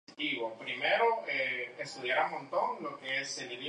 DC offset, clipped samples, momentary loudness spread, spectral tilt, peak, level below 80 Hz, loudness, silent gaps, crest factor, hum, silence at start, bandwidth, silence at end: under 0.1%; under 0.1%; 9 LU; -2.5 dB/octave; -16 dBFS; -88 dBFS; -33 LUFS; none; 18 dB; none; 0.1 s; 10.5 kHz; 0 s